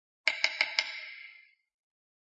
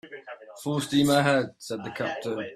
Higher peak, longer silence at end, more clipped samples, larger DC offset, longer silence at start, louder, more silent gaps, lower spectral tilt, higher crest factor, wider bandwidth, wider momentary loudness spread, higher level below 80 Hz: about the same, -6 dBFS vs -6 dBFS; first, 0.9 s vs 0 s; neither; neither; first, 0.25 s vs 0.05 s; second, -30 LUFS vs -26 LUFS; neither; second, 3 dB/octave vs -5 dB/octave; first, 30 dB vs 20 dB; second, 9 kHz vs 15 kHz; about the same, 18 LU vs 20 LU; second, -88 dBFS vs -62 dBFS